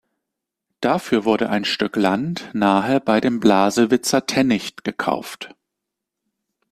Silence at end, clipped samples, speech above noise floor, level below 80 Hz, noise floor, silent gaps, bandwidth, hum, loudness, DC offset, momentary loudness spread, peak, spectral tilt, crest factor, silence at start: 1.25 s; under 0.1%; 64 dB; -58 dBFS; -82 dBFS; none; 14.5 kHz; none; -19 LUFS; under 0.1%; 9 LU; -2 dBFS; -4.5 dB/octave; 18 dB; 0.8 s